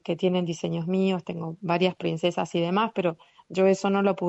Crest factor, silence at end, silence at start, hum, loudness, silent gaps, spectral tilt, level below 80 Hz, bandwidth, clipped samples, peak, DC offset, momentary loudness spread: 16 dB; 0 s; 0.05 s; none; -26 LUFS; none; -6.5 dB/octave; -68 dBFS; 8.2 kHz; under 0.1%; -10 dBFS; under 0.1%; 8 LU